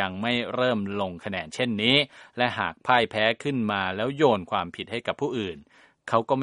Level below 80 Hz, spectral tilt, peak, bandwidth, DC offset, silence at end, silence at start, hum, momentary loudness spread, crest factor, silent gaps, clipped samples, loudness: -62 dBFS; -5.5 dB/octave; -4 dBFS; 11 kHz; under 0.1%; 0 s; 0 s; none; 11 LU; 22 dB; none; under 0.1%; -25 LUFS